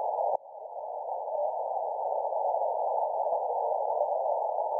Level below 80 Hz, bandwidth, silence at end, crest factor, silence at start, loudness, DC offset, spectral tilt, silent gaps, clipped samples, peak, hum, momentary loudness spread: -82 dBFS; 1.2 kHz; 0 s; 16 dB; 0 s; -31 LUFS; under 0.1%; -8 dB/octave; none; under 0.1%; -14 dBFS; none; 7 LU